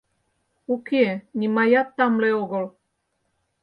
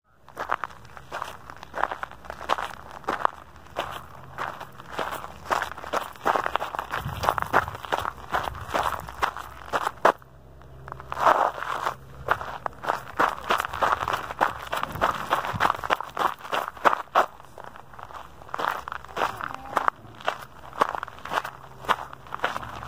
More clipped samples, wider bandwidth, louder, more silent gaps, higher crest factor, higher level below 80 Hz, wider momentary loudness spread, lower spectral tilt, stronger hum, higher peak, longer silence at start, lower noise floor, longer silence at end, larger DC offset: neither; second, 5.4 kHz vs 16 kHz; first, -22 LUFS vs -28 LUFS; neither; second, 18 dB vs 28 dB; second, -72 dBFS vs -52 dBFS; second, 11 LU vs 15 LU; first, -8 dB/octave vs -3.5 dB/octave; neither; second, -6 dBFS vs 0 dBFS; first, 0.7 s vs 0 s; first, -74 dBFS vs -49 dBFS; first, 0.95 s vs 0 s; second, under 0.1% vs 0.3%